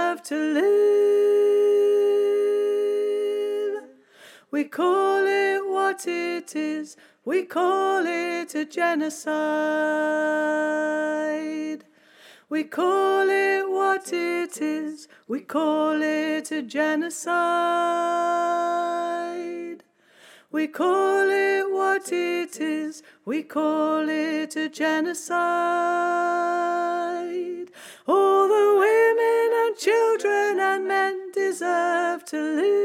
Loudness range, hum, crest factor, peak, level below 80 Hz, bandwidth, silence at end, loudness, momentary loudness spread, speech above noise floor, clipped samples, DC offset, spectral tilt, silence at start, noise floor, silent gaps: 5 LU; none; 14 dB; -10 dBFS; -88 dBFS; 15 kHz; 0 s; -23 LUFS; 11 LU; 32 dB; under 0.1%; under 0.1%; -3 dB/octave; 0 s; -54 dBFS; none